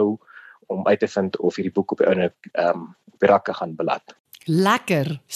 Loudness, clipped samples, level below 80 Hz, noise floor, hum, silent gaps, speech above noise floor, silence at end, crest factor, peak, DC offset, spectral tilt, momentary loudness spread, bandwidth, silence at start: -22 LUFS; under 0.1%; -68 dBFS; -47 dBFS; none; 4.20-4.24 s; 26 dB; 0 s; 18 dB; -4 dBFS; under 0.1%; -6 dB/octave; 11 LU; 13 kHz; 0 s